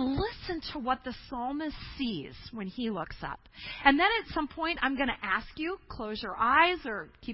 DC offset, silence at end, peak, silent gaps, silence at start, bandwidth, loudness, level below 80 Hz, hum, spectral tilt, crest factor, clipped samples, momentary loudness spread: under 0.1%; 0 s; -6 dBFS; none; 0 s; 5.8 kHz; -30 LUFS; -50 dBFS; none; -8.5 dB/octave; 26 dB; under 0.1%; 16 LU